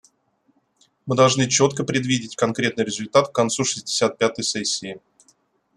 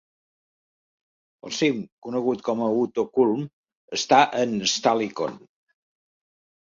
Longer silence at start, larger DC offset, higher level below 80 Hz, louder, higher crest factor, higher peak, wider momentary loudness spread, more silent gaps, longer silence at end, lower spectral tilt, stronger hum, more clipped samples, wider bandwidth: second, 1.05 s vs 1.45 s; neither; first, -62 dBFS vs -70 dBFS; about the same, -21 LUFS vs -23 LUFS; about the same, 20 dB vs 22 dB; about the same, -2 dBFS vs -4 dBFS; second, 8 LU vs 13 LU; second, none vs 1.92-2.02 s, 3.53-3.64 s, 3.75-3.88 s; second, 0.8 s vs 1.35 s; about the same, -3.5 dB/octave vs -4 dB/octave; neither; neither; first, 12.5 kHz vs 7.6 kHz